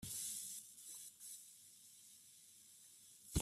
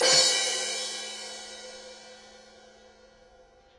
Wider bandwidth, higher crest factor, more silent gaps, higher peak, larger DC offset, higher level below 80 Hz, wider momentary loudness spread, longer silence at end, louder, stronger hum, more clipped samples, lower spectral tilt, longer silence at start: first, 16 kHz vs 11.5 kHz; about the same, 26 dB vs 22 dB; neither; second, -24 dBFS vs -8 dBFS; neither; first, -58 dBFS vs -70 dBFS; second, 16 LU vs 27 LU; second, 0 s vs 1.4 s; second, -51 LUFS vs -25 LUFS; neither; neither; first, -3 dB/octave vs 1 dB/octave; about the same, 0 s vs 0 s